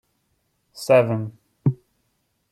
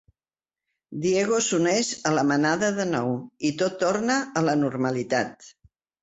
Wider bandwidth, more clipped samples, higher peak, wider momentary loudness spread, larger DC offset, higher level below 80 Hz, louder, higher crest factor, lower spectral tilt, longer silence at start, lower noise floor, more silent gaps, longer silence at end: first, 15 kHz vs 8.2 kHz; neither; about the same, -4 dBFS vs -6 dBFS; first, 18 LU vs 6 LU; neither; about the same, -62 dBFS vs -64 dBFS; first, -21 LUFS vs -24 LUFS; about the same, 20 dB vs 18 dB; first, -7 dB/octave vs -4.5 dB/octave; second, 0.75 s vs 0.9 s; second, -71 dBFS vs under -90 dBFS; neither; first, 0.8 s vs 0.55 s